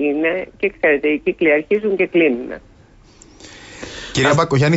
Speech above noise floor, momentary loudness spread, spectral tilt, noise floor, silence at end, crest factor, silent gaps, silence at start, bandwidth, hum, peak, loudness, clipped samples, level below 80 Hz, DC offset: 31 dB; 18 LU; -6 dB/octave; -47 dBFS; 0 s; 14 dB; none; 0 s; 8 kHz; none; -4 dBFS; -17 LUFS; under 0.1%; -48 dBFS; under 0.1%